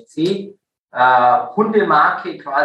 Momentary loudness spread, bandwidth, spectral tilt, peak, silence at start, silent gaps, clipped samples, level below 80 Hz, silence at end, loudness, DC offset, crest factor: 13 LU; 9.2 kHz; -6.5 dB/octave; -2 dBFS; 0.15 s; 0.79-0.86 s; under 0.1%; -74 dBFS; 0 s; -15 LUFS; under 0.1%; 14 dB